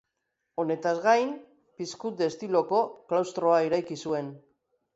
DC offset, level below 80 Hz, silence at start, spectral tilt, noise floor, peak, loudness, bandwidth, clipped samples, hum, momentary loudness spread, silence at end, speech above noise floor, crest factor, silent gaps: under 0.1%; -76 dBFS; 0.6 s; -5 dB/octave; -81 dBFS; -10 dBFS; -27 LUFS; 8 kHz; under 0.1%; none; 15 LU; 0.55 s; 54 dB; 18 dB; none